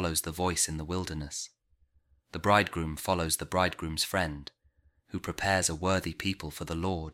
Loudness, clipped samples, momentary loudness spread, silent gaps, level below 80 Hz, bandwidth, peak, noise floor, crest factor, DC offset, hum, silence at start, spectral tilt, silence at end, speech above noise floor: -30 LUFS; under 0.1%; 13 LU; none; -48 dBFS; 16.5 kHz; -8 dBFS; -68 dBFS; 22 dB; under 0.1%; none; 0 s; -3.5 dB/octave; 0 s; 38 dB